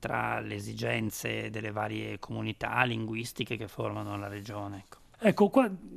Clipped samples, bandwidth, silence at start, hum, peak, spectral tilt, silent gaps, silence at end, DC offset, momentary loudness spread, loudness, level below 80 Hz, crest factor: under 0.1%; 14.5 kHz; 0 s; none; -8 dBFS; -5.5 dB/octave; none; 0 s; under 0.1%; 13 LU; -32 LUFS; -60 dBFS; 24 dB